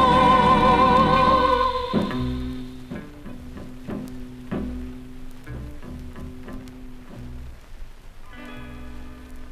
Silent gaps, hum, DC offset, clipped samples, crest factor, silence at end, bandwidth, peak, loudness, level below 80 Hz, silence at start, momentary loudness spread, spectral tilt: none; none; under 0.1%; under 0.1%; 18 dB; 0 s; 14 kHz; -6 dBFS; -19 LUFS; -36 dBFS; 0 s; 26 LU; -6.5 dB/octave